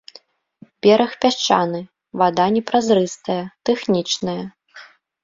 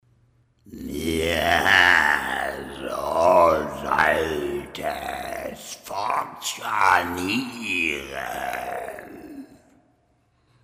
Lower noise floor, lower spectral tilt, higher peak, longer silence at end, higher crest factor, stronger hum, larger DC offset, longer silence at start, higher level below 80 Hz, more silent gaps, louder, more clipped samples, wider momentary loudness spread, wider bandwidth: second, -50 dBFS vs -65 dBFS; first, -4.5 dB/octave vs -3 dB/octave; about the same, -2 dBFS vs -4 dBFS; second, 0.4 s vs 1.2 s; about the same, 18 dB vs 20 dB; neither; neither; first, 0.85 s vs 0.65 s; second, -62 dBFS vs -48 dBFS; neither; first, -19 LUFS vs -22 LUFS; neither; second, 11 LU vs 17 LU; second, 7.8 kHz vs 16 kHz